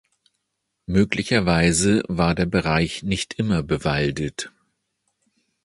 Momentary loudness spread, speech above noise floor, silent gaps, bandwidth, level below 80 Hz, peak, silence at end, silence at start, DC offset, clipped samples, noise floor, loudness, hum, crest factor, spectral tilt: 10 LU; 57 dB; none; 11.5 kHz; -40 dBFS; -4 dBFS; 1.15 s; 0.9 s; under 0.1%; under 0.1%; -77 dBFS; -21 LUFS; none; 20 dB; -5 dB/octave